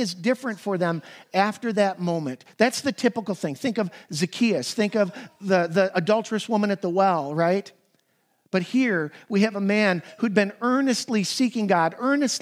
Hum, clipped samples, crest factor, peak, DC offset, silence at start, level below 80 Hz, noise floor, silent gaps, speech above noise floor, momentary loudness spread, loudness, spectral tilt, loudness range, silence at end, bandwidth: none; under 0.1%; 20 dB; -4 dBFS; under 0.1%; 0 s; -80 dBFS; -68 dBFS; none; 45 dB; 6 LU; -24 LUFS; -5 dB/octave; 2 LU; 0 s; 15.5 kHz